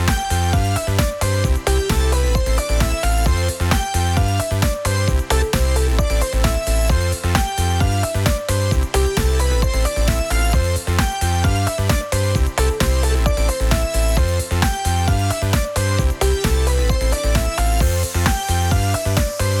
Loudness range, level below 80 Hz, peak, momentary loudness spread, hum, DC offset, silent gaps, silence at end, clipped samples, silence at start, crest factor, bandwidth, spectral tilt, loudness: 0 LU; -20 dBFS; 0 dBFS; 2 LU; none; under 0.1%; none; 0 s; under 0.1%; 0 s; 16 dB; 18.5 kHz; -4.5 dB/octave; -19 LUFS